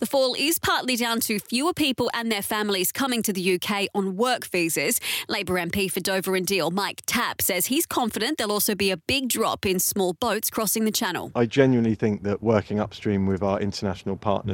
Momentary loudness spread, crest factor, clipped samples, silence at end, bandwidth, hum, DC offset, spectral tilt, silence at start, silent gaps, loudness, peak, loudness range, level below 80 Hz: 4 LU; 20 dB; under 0.1%; 0 s; 17 kHz; none; under 0.1%; -3.5 dB/octave; 0 s; none; -24 LUFS; -4 dBFS; 1 LU; -54 dBFS